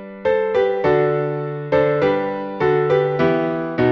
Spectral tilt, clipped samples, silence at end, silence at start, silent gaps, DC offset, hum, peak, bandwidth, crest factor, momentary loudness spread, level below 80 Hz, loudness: -8.5 dB/octave; under 0.1%; 0 s; 0 s; none; under 0.1%; none; -4 dBFS; 6.2 kHz; 14 dB; 5 LU; -50 dBFS; -19 LUFS